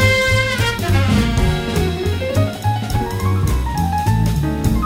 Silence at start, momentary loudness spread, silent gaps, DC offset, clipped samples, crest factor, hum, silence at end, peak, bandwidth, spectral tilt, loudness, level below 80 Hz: 0 s; 4 LU; none; under 0.1%; under 0.1%; 16 dB; none; 0 s; -2 dBFS; 16.5 kHz; -5.5 dB/octave; -18 LUFS; -24 dBFS